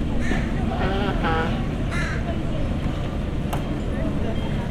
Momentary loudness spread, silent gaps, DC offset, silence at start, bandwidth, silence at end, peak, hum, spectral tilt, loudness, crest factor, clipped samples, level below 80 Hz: 4 LU; none; under 0.1%; 0 s; 13 kHz; 0 s; -10 dBFS; none; -7 dB/octave; -25 LUFS; 14 dB; under 0.1%; -28 dBFS